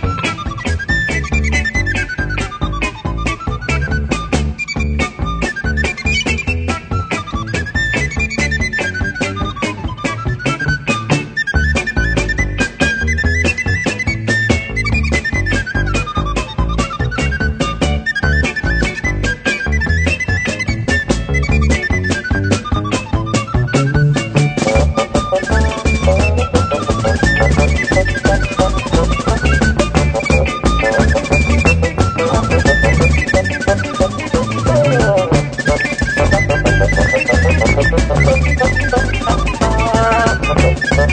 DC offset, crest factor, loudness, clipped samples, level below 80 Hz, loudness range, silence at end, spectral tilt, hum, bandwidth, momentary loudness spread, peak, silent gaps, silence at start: under 0.1%; 14 dB; -15 LUFS; under 0.1%; -20 dBFS; 4 LU; 0 s; -5.5 dB/octave; none; 9.4 kHz; 7 LU; 0 dBFS; none; 0 s